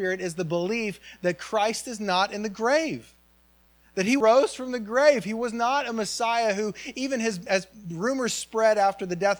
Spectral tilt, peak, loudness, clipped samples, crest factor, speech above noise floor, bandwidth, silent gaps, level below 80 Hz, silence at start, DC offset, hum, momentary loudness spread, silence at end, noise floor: -4 dB/octave; -6 dBFS; -25 LUFS; under 0.1%; 18 dB; 35 dB; over 20 kHz; none; -64 dBFS; 0 s; under 0.1%; none; 10 LU; 0 s; -60 dBFS